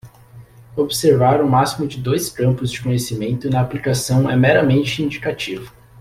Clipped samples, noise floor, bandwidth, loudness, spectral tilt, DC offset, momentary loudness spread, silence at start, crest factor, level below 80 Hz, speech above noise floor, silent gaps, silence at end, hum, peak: under 0.1%; -43 dBFS; 15.5 kHz; -18 LUFS; -5.5 dB/octave; under 0.1%; 10 LU; 0.05 s; 16 dB; -46 dBFS; 26 dB; none; 0.3 s; none; -2 dBFS